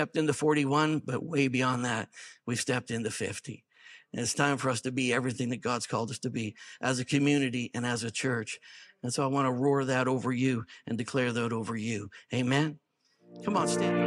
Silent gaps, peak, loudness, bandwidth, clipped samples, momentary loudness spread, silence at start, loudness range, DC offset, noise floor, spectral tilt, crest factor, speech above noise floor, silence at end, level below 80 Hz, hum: none; -10 dBFS; -30 LUFS; 13.5 kHz; under 0.1%; 11 LU; 0 s; 2 LU; under 0.1%; -60 dBFS; -5 dB/octave; 20 dB; 30 dB; 0 s; -74 dBFS; none